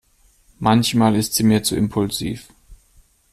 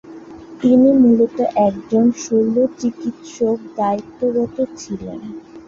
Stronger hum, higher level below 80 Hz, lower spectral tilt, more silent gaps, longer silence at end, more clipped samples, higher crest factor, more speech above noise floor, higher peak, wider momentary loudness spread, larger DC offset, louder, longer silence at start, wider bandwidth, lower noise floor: neither; first, -46 dBFS vs -54 dBFS; second, -5 dB/octave vs -7 dB/octave; neither; first, 0.55 s vs 0.05 s; neither; about the same, 18 dB vs 14 dB; first, 38 dB vs 20 dB; about the same, -4 dBFS vs -2 dBFS; second, 9 LU vs 18 LU; neither; about the same, -18 LUFS vs -17 LUFS; first, 0.6 s vs 0.05 s; first, 15.5 kHz vs 7.4 kHz; first, -56 dBFS vs -36 dBFS